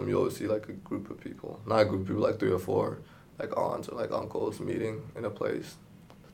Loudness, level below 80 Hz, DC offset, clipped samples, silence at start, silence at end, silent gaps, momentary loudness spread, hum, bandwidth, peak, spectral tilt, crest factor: -32 LUFS; -64 dBFS; under 0.1%; under 0.1%; 0 s; 0 s; none; 14 LU; none; 17 kHz; -10 dBFS; -7 dB/octave; 22 dB